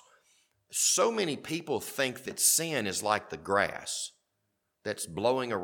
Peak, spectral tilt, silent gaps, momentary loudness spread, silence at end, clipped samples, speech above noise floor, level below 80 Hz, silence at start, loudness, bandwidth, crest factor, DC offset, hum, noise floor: -10 dBFS; -2 dB/octave; none; 12 LU; 0 s; under 0.1%; 50 dB; -70 dBFS; 0.7 s; -29 LUFS; 19 kHz; 22 dB; under 0.1%; none; -80 dBFS